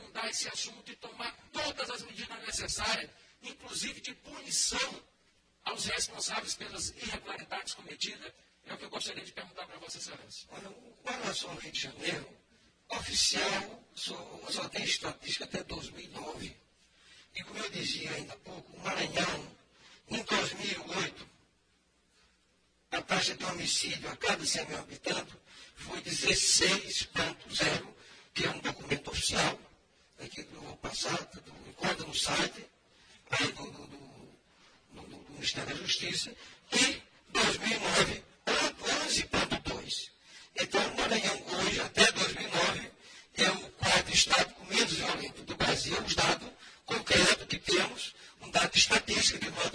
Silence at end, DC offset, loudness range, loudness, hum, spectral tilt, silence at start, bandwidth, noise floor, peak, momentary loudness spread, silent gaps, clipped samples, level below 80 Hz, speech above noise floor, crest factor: 0 s; under 0.1%; 11 LU; -31 LUFS; none; -1.5 dB/octave; 0 s; 10.5 kHz; -71 dBFS; -10 dBFS; 20 LU; none; under 0.1%; -58 dBFS; 37 dB; 26 dB